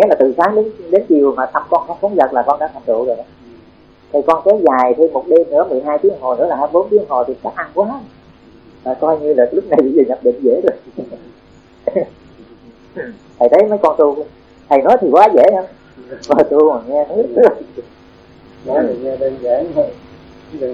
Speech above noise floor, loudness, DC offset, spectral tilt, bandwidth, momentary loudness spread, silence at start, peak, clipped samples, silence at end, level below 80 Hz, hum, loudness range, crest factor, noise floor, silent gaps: 31 dB; -14 LUFS; under 0.1%; -7.5 dB/octave; 7.2 kHz; 17 LU; 0 s; 0 dBFS; 0.3%; 0 s; -52 dBFS; none; 5 LU; 14 dB; -44 dBFS; none